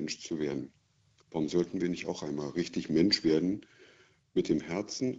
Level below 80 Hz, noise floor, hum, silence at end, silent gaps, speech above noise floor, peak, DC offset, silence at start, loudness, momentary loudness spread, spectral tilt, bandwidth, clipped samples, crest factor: -62 dBFS; -68 dBFS; none; 0 s; none; 37 dB; -14 dBFS; under 0.1%; 0 s; -32 LUFS; 10 LU; -5 dB/octave; 8 kHz; under 0.1%; 18 dB